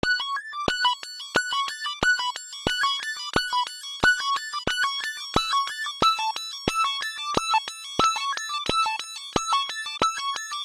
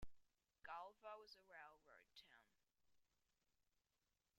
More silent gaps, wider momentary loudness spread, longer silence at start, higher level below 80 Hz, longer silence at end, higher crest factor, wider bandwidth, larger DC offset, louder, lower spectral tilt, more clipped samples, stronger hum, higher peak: neither; second, 7 LU vs 11 LU; about the same, 0.05 s vs 0 s; first, -50 dBFS vs -76 dBFS; about the same, 0 s vs 0 s; about the same, 22 dB vs 20 dB; about the same, 16 kHz vs 16 kHz; neither; first, -25 LUFS vs -61 LUFS; second, -1.5 dB/octave vs -3.5 dB/octave; neither; neither; first, -4 dBFS vs -42 dBFS